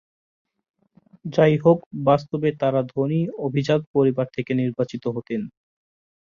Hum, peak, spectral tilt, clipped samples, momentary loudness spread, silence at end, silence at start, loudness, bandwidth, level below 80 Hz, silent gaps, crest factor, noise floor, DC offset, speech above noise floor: none; -4 dBFS; -8.5 dB/octave; under 0.1%; 10 LU; 0.85 s; 1.25 s; -22 LUFS; 7.2 kHz; -60 dBFS; 1.86-1.91 s, 3.87-3.94 s; 18 dB; -56 dBFS; under 0.1%; 35 dB